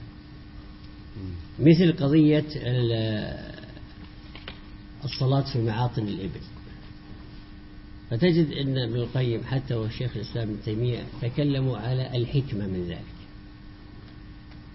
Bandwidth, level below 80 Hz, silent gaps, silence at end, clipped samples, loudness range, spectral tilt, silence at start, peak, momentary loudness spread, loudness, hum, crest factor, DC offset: 5.8 kHz; -46 dBFS; none; 0 s; under 0.1%; 6 LU; -10.5 dB/octave; 0 s; -6 dBFS; 25 LU; -26 LUFS; none; 22 dB; under 0.1%